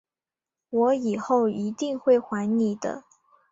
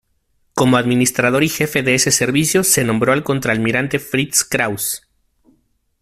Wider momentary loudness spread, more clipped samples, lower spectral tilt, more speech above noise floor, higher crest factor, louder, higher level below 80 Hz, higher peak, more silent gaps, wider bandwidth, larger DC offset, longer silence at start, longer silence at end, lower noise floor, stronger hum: first, 9 LU vs 6 LU; neither; first, -6.5 dB/octave vs -3.5 dB/octave; first, over 66 dB vs 47 dB; about the same, 16 dB vs 18 dB; second, -25 LUFS vs -16 LUFS; second, -70 dBFS vs -50 dBFS; second, -10 dBFS vs 0 dBFS; neither; second, 7.8 kHz vs 16 kHz; neither; first, 0.7 s vs 0.55 s; second, 0.5 s vs 1.05 s; first, under -90 dBFS vs -63 dBFS; neither